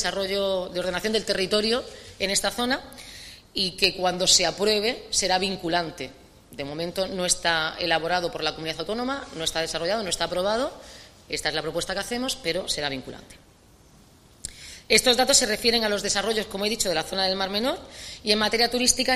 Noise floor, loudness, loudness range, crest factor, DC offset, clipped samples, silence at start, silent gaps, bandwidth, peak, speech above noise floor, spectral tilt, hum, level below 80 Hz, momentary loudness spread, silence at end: -54 dBFS; -24 LUFS; 6 LU; 22 dB; under 0.1%; under 0.1%; 0 s; none; 15.5 kHz; -4 dBFS; 29 dB; -2 dB/octave; none; -50 dBFS; 18 LU; 0 s